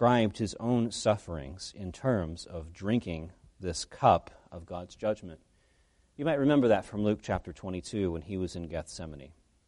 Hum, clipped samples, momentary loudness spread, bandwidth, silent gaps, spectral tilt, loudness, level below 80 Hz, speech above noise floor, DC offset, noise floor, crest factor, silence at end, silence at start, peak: none; under 0.1%; 17 LU; 11.5 kHz; none; -6 dB/octave; -31 LUFS; -52 dBFS; 37 dB; under 0.1%; -67 dBFS; 22 dB; 0.4 s; 0 s; -10 dBFS